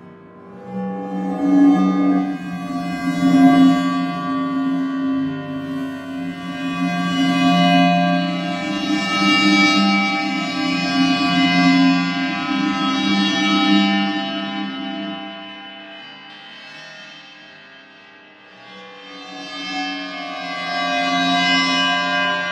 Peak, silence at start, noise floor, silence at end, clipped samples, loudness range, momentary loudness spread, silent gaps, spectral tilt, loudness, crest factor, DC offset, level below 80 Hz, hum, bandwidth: -2 dBFS; 0 s; -45 dBFS; 0 s; under 0.1%; 17 LU; 21 LU; none; -5 dB/octave; -18 LUFS; 18 dB; under 0.1%; -60 dBFS; none; 11 kHz